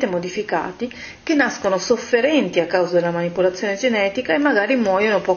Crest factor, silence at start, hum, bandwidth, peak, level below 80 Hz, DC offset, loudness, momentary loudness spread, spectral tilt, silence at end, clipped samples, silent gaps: 16 dB; 0 s; none; 7 kHz; -2 dBFS; -56 dBFS; under 0.1%; -19 LUFS; 7 LU; -4.5 dB/octave; 0 s; under 0.1%; none